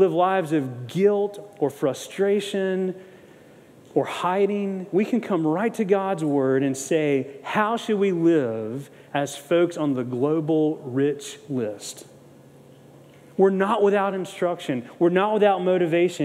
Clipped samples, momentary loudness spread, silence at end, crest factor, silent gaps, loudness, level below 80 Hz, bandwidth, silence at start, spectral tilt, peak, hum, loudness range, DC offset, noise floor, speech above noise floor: under 0.1%; 10 LU; 0 s; 18 dB; none; -23 LUFS; -78 dBFS; 15 kHz; 0 s; -6 dB/octave; -6 dBFS; none; 4 LU; under 0.1%; -49 dBFS; 27 dB